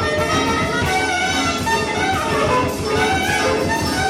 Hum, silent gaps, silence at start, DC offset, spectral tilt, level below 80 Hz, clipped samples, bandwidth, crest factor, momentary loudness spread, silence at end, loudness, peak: none; none; 0 s; under 0.1%; -4 dB/octave; -36 dBFS; under 0.1%; 16.5 kHz; 12 dB; 2 LU; 0 s; -18 LUFS; -8 dBFS